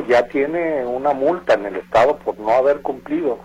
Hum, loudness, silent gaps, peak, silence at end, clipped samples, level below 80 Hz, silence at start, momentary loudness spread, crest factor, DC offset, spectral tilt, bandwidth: none; -19 LUFS; none; -4 dBFS; 0 s; under 0.1%; -50 dBFS; 0 s; 6 LU; 14 dB; under 0.1%; -6 dB/octave; 11 kHz